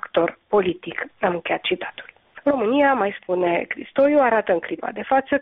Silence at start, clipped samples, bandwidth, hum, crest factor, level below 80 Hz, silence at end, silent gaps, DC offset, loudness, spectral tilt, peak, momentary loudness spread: 0.05 s; under 0.1%; 4 kHz; none; 14 dB; -60 dBFS; 0 s; none; under 0.1%; -21 LUFS; -3 dB/octave; -6 dBFS; 11 LU